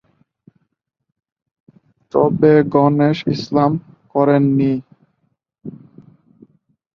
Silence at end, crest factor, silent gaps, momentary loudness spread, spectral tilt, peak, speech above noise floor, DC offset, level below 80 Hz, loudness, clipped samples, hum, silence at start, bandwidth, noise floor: 1.2 s; 18 dB; none; 20 LU; -9 dB/octave; -2 dBFS; 59 dB; under 0.1%; -56 dBFS; -16 LUFS; under 0.1%; none; 2.15 s; 6.6 kHz; -73 dBFS